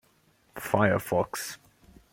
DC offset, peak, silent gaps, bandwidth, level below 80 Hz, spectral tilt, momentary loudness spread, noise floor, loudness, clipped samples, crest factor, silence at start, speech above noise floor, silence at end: under 0.1%; -8 dBFS; none; 17 kHz; -62 dBFS; -5.5 dB/octave; 20 LU; -65 dBFS; -28 LUFS; under 0.1%; 22 dB; 0.55 s; 38 dB; 0.55 s